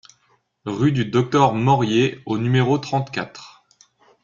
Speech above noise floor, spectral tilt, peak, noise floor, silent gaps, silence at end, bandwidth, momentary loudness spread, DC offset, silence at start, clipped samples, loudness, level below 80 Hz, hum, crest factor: 45 dB; -6.5 dB/octave; -2 dBFS; -63 dBFS; none; 0.75 s; 7.4 kHz; 13 LU; under 0.1%; 0.65 s; under 0.1%; -20 LUFS; -56 dBFS; none; 18 dB